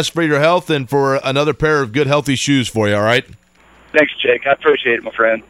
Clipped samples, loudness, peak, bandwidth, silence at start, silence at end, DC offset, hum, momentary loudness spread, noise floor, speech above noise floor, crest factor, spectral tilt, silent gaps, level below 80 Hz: under 0.1%; -15 LUFS; 0 dBFS; 16 kHz; 0 s; 0.1 s; under 0.1%; none; 3 LU; -48 dBFS; 33 dB; 16 dB; -5 dB/octave; none; -46 dBFS